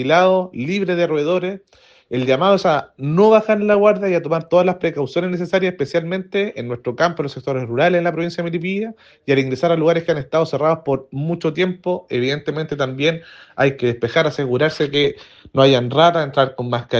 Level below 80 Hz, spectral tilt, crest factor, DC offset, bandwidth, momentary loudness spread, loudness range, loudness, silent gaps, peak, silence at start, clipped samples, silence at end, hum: -58 dBFS; -6.5 dB/octave; 18 dB; under 0.1%; 7.6 kHz; 10 LU; 4 LU; -18 LUFS; none; 0 dBFS; 0 s; under 0.1%; 0 s; none